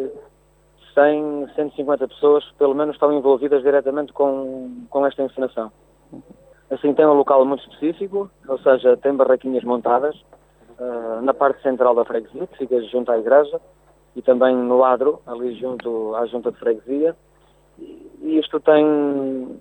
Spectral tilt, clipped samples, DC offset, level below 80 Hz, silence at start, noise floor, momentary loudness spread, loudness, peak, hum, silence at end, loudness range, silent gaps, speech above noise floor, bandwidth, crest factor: -7.5 dB/octave; under 0.1%; under 0.1%; -60 dBFS; 0 s; -56 dBFS; 12 LU; -19 LUFS; -4 dBFS; none; 0.05 s; 4 LU; none; 37 dB; 8.4 kHz; 16 dB